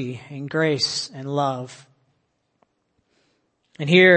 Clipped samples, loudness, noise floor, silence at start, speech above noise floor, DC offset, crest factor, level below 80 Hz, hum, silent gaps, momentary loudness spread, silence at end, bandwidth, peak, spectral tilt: under 0.1%; -22 LUFS; -71 dBFS; 0 s; 50 dB; under 0.1%; 22 dB; -70 dBFS; none; none; 15 LU; 0 s; 8.8 kHz; -2 dBFS; -5 dB/octave